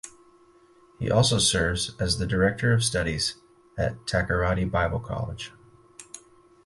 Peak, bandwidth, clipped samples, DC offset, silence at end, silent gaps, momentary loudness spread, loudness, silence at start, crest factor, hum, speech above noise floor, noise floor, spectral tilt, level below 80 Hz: -6 dBFS; 11.5 kHz; under 0.1%; under 0.1%; 0.45 s; none; 20 LU; -25 LUFS; 0.05 s; 20 dB; none; 32 dB; -57 dBFS; -4 dB/octave; -40 dBFS